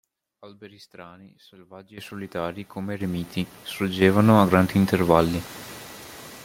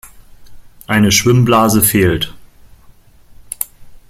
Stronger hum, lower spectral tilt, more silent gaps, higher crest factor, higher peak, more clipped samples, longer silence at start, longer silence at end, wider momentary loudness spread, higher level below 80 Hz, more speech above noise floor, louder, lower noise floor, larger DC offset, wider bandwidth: neither; first, -6.5 dB/octave vs -4.5 dB/octave; neither; first, 22 dB vs 16 dB; about the same, -2 dBFS vs 0 dBFS; neither; first, 0.45 s vs 0.05 s; second, 0 s vs 0.15 s; first, 23 LU vs 14 LU; second, -54 dBFS vs -40 dBFS; second, 18 dB vs 32 dB; second, -22 LUFS vs -13 LUFS; about the same, -42 dBFS vs -43 dBFS; neither; about the same, 16.5 kHz vs 16.5 kHz